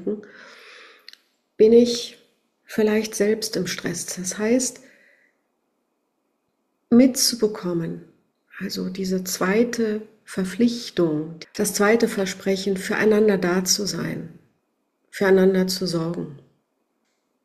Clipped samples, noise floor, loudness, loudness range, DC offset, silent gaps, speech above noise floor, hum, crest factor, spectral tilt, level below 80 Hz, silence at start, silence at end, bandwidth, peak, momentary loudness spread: under 0.1%; -73 dBFS; -21 LUFS; 4 LU; under 0.1%; none; 52 dB; none; 20 dB; -4 dB/octave; -60 dBFS; 0 s; 1.05 s; 14 kHz; -4 dBFS; 15 LU